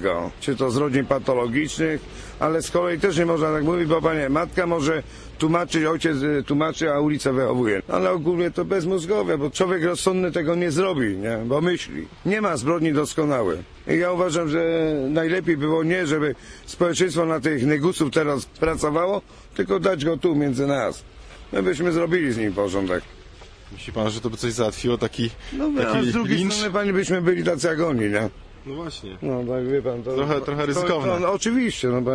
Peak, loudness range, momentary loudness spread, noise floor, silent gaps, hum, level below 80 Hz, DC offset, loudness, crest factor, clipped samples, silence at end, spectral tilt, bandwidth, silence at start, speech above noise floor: -8 dBFS; 3 LU; 6 LU; -44 dBFS; none; none; -46 dBFS; under 0.1%; -22 LUFS; 14 dB; under 0.1%; 0 s; -5.5 dB/octave; 11 kHz; 0 s; 22 dB